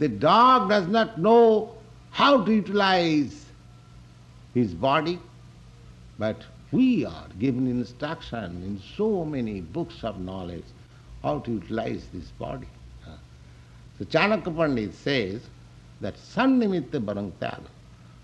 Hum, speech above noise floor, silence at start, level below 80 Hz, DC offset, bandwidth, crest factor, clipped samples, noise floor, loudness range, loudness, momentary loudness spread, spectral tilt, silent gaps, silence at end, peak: none; 25 dB; 0 s; -52 dBFS; under 0.1%; 8.8 kHz; 20 dB; under 0.1%; -49 dBFS; 11 LU; -24 LUFS; 18 LU; -6.5 dB/octave; none; 0.3 s; -6 dBFS